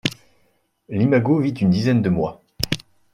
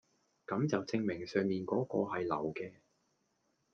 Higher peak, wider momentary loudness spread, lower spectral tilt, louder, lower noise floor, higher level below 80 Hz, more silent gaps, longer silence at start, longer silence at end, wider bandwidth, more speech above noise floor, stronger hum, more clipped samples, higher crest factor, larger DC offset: first, 0 dBFS vs -18 dBFS; about the same, 10 LU vs 9 LU; about the same, -6.5 dB/octave vs -7 dB/octave; first, -20 LUFS vs -36 LUFS; second, -65 dBFS vs -79 dBFS; first, -48 dBFS vs -76 dBFS; neither; second, 0.05 s vs 0.5 s; second, 0.35 s vs 1 s; first, 16 kHz vs 7.2 kHz; first, 47 dB vs 43 dB; neither; neither; about the same, 20 dB vs 20 dB; neither